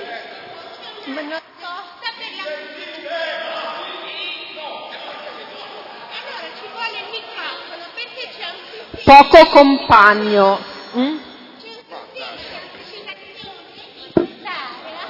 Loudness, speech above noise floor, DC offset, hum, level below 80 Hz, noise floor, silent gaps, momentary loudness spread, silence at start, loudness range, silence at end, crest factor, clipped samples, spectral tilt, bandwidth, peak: -14 LUFS; 27 dB; under 0.1%; none; -46 dBFS; -39 dBFS; none; 25 LU; 0 s; 18 LU; 0 s; 18 dB; 0.3%; -5.5 dB/octave; 6 kHz; 0 dBFS